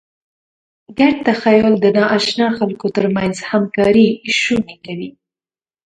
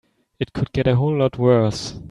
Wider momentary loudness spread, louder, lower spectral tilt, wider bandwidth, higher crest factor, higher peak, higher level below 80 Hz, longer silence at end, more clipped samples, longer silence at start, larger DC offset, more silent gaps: first, 15 LU vs 12 LU; first, -15 LUFS vs -20 LUFS; second, -5.5 dB/octave vs -7 dB/octave; second, 9.4 kHz vs 10.5 kHz; about the same, 16 dB vs 16 dB; first, 0 dBFS vs -4 dBFS; second, -50 dBFS vs -44 dBFS; first, 0.75 s vs 0.05 s; neither; first, 0.9 s vs 0.4 s; neither; neither